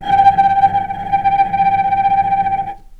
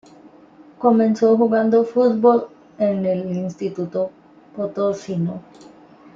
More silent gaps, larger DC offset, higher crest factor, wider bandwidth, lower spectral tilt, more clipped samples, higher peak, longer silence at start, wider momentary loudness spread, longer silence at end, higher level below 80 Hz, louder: neither; neither; about the same, 14 dB vs 18 dB; second, 5 kHz vs 7.4 kHz; second, -6 dB/octave vs -8 dB/octave; neither; about the same, 0 dBFS vs -2 dBFS; second, 0 s vs 0.8 s; second, 8 LU vs 12 LU; second, 0.05 s vs 0.75 s; first, -40 dBFS vs -66 dBFS; first, -14 LUFS vs -19 LUFS